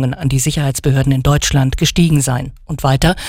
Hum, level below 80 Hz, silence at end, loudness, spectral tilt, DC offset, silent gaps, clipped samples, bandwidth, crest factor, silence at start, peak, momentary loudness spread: none; -26 dBFS; 0 s; -14 LUFS; -5 dB/octave; under 0.1%; none; under 0.1%; 16.5 kHz; 12 dB; 0 s; -2 dBFS; 6 LU